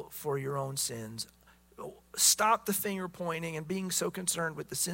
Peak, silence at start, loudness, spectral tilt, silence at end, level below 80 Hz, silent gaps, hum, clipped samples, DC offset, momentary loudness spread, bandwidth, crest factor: -10 dBFS; 0 s; -31 LUFS; -2.5 dB/octave; 0 s; -66 dBFS; none; none; under 0.1%; under 0.1%; 17 LU; 16.5 kHz; 22 dB